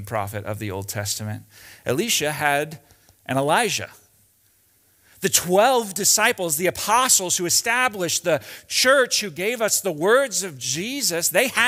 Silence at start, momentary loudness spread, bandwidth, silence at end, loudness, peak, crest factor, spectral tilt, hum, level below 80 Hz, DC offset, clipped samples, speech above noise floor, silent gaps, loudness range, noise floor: 0 s; 12 LU; 16 kHz; 0 s; -20 LUFS; -2 dBFS; 20 dB; -2 dB/octave; none; -62 dBFS; under 0.1%; under 0.1%; 39 dB; none; 6 LU; -61 dBFS